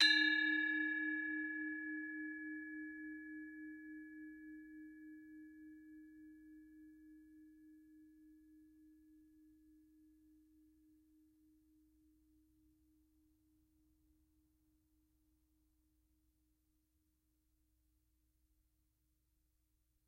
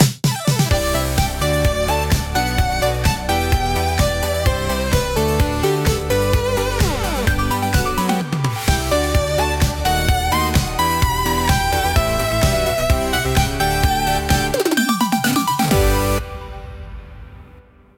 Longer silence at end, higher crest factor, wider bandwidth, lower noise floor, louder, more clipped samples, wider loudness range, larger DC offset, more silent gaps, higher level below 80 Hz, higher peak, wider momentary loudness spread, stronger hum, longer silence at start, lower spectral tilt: first, 10.9 s vs 0.35 s; first, 28 dB vs 18 dB; second, 15.5 kHz vs 18 kHz; first, -82 dBFS vs -45 dBFS; second, -39 LUFS vs -18 LUFS; neither; first, 25 LU vs 1 LU; neither; neither; second, -82 dBFS vs -24 dBFS; second, -18 dBFS vs 0 dBFS; first, 26 LU vs 3 LU; neither; about the same, 0 s vs 0 s; second, -1 dB/octave vs -4.5 dB/octave